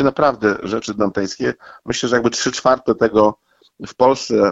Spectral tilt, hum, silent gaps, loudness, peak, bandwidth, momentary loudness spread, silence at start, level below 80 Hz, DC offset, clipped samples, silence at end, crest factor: -4.5 dB/octave; none; none; -18 LUFS; -2 dBFS; 8 kHz; 9 LU; 0 s; -50 dBFS; under 0.1%; under 0.1%; 0 s; 16 dB